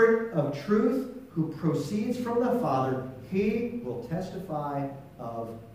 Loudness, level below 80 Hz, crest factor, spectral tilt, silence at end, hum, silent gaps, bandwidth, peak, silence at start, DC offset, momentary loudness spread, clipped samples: -30 LUFS; -60 dBFS; 18 dB; -7.5 dB/octave; 0 s; none; none; 15.5 kHz; -10 dBFS; 0 s; under 0.1%; 11 LU; under 0.1%